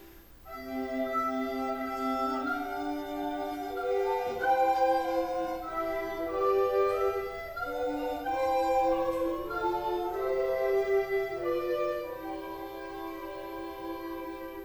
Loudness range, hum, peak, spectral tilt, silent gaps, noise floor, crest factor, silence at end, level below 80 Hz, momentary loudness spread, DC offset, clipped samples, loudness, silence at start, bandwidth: 4 LU; none; -16 dBFS; -5 dB/octave; none; -51 dBFS; 16 dB; 0 s; -56 dBFS; 12 LU; under 0.1%; under 0.1%; -31 LUFS; 0 s; over 20 kHz